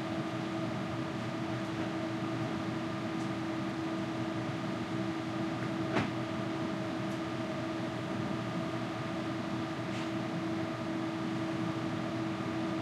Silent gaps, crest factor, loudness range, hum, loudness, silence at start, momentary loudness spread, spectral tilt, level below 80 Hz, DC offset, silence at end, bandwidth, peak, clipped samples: none; 18 dB; 1 LU; none; -36 LUFS; 0 s; 1 LU; -6.5 dB/octave; -66 dBFS; under 0.1%; 0 s; 12.5 kHz; -18 dBFS; under 0.1%